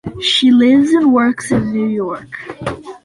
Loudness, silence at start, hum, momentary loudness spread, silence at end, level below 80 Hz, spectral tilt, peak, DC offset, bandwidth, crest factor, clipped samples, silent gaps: -13 LUFS; 0.05 s; none; 15 LU; 0.1 s; -46 dBFS; -5 dB/octave; -2 dBFS; under 0.1%; 11.5 kHz; 12 dB; under 0.1%; none